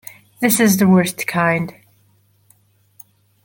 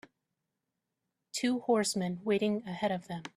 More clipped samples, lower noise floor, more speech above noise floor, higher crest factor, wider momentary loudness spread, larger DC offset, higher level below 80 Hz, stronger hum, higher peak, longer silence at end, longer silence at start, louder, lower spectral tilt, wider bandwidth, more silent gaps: neither; second, -57 dBFS vs -86 dBFS; second, 42 dB vs 55 dB; about the same, 18 dB vs 18 dB; first, 12 LU vs 6 LU; neither; first, -58 dBFS vs -74 dBFS; first, 50 Hz at -40 dBFS vs none; first, -2 dBFS vs -16 dBFS; first, 1.75 s vs 0.1 s; second, 0.4 s vs 1.35 s; first, -16 LUFS vs -32 LUFS; about the same, -5 dB/octave vs -4.5 dB/octave; first, 17 kHz vs 14 kHz; neither